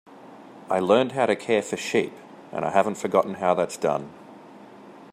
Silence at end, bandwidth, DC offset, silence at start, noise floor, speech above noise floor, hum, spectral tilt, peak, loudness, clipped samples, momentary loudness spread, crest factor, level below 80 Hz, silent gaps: 0.1 s; 15 kHz; under 0.1%; 0.1 s; -46 dBFS; 23 dB; none; -5 dB/octave; -4 dBFS; -24 LUFS; under 0.1%; 14 LU; 20 dB; -70 dBFS; none